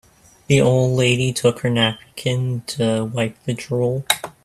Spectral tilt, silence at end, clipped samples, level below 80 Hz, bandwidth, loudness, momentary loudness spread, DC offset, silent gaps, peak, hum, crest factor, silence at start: -5 dB/octave; 0.15 s; under 0.1%; -52 dBFS; 14.5 kHz; -19 LUFS; 8 LU; under 0.1%; none; 0 dBFS; none; 20 dB; 0.5 s